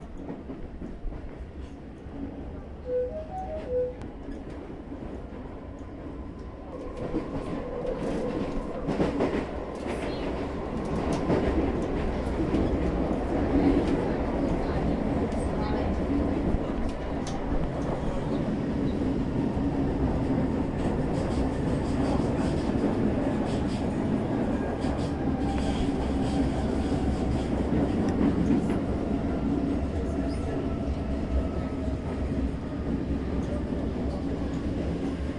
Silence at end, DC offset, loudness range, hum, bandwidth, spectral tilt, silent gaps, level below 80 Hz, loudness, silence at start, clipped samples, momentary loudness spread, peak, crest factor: 0 s; under 0.1%; 8 LU; none; 11 kHz; -8 dB/octave; none; -36 dBFS; -29 LUFS; 0 s; under 0.1%; 13 LU; -12 dBFS; 16 dB